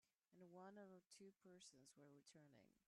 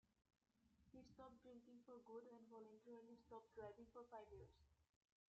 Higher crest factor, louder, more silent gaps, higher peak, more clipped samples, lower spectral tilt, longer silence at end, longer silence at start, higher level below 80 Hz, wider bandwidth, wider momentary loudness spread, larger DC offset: about the same, 16 dB vs 18 dB; second, -66 LUFS vs -63 LUFS; first, 1.06-1.10 s vs none; second, -52 dBFS vs -46 dBFS; neither; second, -4 dB/octave vs -6 dB/octave; second, 0.05 s vs 0.45 s; about the same, 0.05 s vs 0.05 s; second, under -90 dBFS vs -82 dBFS; first, 12 kHz vs 7.4 kHz; about the same, 6 LU vs 6 LU; neither